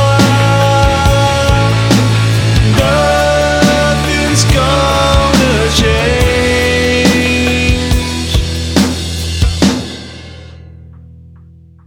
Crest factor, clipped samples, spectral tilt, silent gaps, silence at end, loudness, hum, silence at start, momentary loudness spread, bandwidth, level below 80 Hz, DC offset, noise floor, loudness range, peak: 10 dB; under 0.1%; -5 dB/octave; none; 0.75 s; -11 LUFS; none; 0 s; 5 LU; 17 kHz; -20 dBFS; under 0.1%; -38 dBFS; 5 LU; 0 dBFS